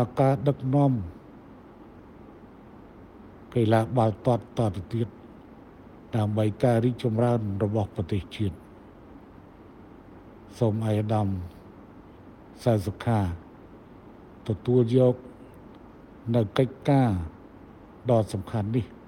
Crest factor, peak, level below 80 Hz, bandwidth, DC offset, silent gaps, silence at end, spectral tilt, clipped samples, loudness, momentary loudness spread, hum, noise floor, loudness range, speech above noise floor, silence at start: 20 dB; -8 dBFS; -52 dBFS; 11.5 kHz; under 0.1%; none; 0.1 s; -8.5 dB/octave; under 0.1%; -26 LUFS; 18 LU; none; -48 dBFS; 5 LU; 24 dB; 0 s